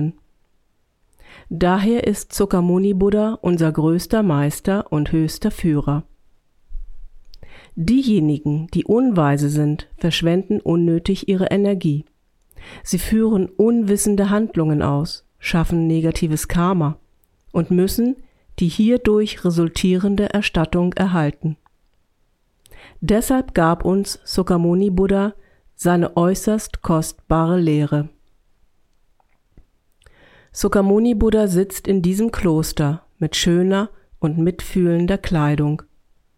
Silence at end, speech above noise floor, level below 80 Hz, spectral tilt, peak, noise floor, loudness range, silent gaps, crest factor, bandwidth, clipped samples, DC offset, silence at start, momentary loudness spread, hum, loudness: 0.55 s; 45 dB; -36 dBFS; -6.5 dB/octave; -2 dBFS; -63 dBFS; 4 LU; none; 16 dB; 16 kHz; under 0.1%; under 0.1%; 0 s; 7 LU; none; -19 LUFS